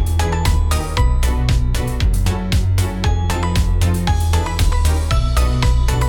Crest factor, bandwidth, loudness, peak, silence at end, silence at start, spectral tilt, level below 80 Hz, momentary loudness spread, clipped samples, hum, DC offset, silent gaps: 12 dB; 18 kHz; -18 LUFS; -2 dBFS; 0 s; 0 s; -5.5 dB/octave; -18 dBFS; 2 LU; under 0.1%; none; under 0.1%; none